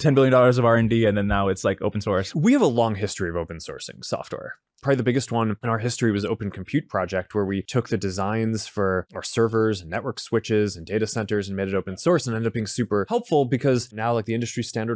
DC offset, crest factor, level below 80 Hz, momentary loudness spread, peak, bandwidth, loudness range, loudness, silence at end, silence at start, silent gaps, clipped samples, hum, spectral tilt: under 0.1%; 16 dB; -46 dBFS; 11 LU; -6 dBFS; 8 kHz; 4 LU; -23 LUFS; 0 s; 0 s; none; under 0.1%; none; -6 dB/octave